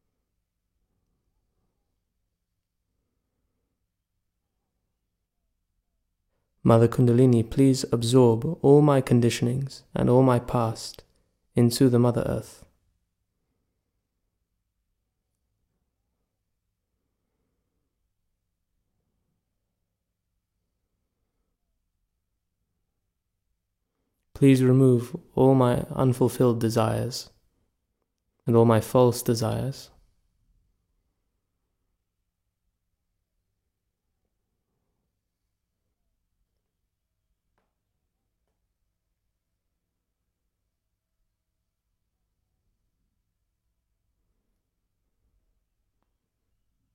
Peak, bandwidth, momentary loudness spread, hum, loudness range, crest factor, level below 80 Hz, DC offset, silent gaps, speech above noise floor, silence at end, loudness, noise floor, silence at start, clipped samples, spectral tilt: -6 dBFS; 16.5 kHz; 13 LU; none; 8 LU; 22 dB; -56 dBFS; under 0.1%; none; 60 dB; 17.1 s; -22 LUFS; -81 dBFS; 6.65 s; under 0.1%; -7 dB/octave